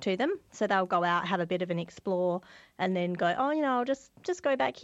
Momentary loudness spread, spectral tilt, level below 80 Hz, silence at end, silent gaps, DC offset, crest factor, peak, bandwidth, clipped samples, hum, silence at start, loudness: 7 LU; -6 dB/octave; -70 dBFS; 0 s; none; under 0.1%; 16 dB; -14 dBFS; 8.2 kHz; under 0.1%; none; 0 s; -30 LUFS